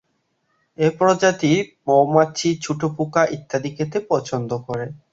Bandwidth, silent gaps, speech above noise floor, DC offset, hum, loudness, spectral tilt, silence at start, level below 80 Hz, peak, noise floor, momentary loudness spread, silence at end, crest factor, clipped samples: 8 kHz; none; 50 dB; under 0.1%; none; -20 LUFS; -5.5 dB/octave; 0.8 s; -58 dBFS; -2 dBFS; -69 dBFS; 10 LU; 0.15 s; 18 dB; under 0.1%